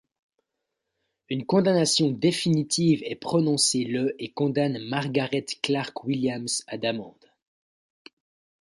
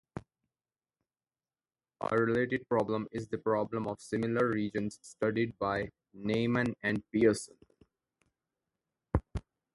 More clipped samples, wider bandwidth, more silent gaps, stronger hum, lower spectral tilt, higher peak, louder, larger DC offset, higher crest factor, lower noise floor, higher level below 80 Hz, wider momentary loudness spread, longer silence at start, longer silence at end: neither; about the same, 11.5 kHz vs 11.5 kHz; neither; neither; second, -4.5 dB/octave vs -6.5 dB/octave; first, -8 dBFS vs -12 dBFS; first, -25 LUFS vs -32 LUFS; neither; about the same, 18 dB vs 22 dB; second, -82 dBFS vs under -90 dBFS; second, -68 dBFS vs -52 dBFS; second, 8 LU vs 12 LU; first, 1.3 s vs 0.15 s; first, 1.5 s vs 0.35 s